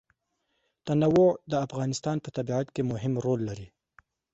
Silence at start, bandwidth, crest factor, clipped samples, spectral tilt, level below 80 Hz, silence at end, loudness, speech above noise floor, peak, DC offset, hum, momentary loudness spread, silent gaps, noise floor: 0.85 s; 8.2 kHz; 16 dB; under 0.1%; -7 dB/octave; -60 dBFS; 0.65 s; -28 LUFS; 51 dB; -12 dBFS; under 0.1%; none; 10 LU; none; -77 dBFS